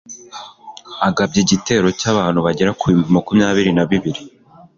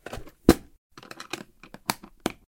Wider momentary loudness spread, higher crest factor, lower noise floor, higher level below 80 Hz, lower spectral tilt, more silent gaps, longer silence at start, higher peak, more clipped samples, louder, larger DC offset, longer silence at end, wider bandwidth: about the same, 19 LU vs 21 LU; second, 16 dB vs 28 dB; second, -37 dBFS vs -48 dBFS; about the same, -46 dBFS vs -44 dBFS; about the same, -5 dB/octave vs -5 dB/octave; second, none vs 0.78-0.90 s; about the same, 0.1 s vs 0.1 s; about the same, -2 dBFS vs 0 dBFS; neither; first, -16 LUFS vs -28 LUFS; neither; first, 0.5 s vs 0.3 s; second, 7.6 kHz vs 17 kHz